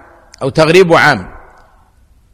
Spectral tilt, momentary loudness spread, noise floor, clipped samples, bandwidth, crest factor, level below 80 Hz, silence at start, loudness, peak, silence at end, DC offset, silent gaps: -5.5 dB/octave; 12 LU; -48 dBFS; 0.3%; 15.5 kHz; 12 dB; -42 dBFS; 0.4 s; -10 LUFS; 0 dBFS; 1 s; under 0.1%; none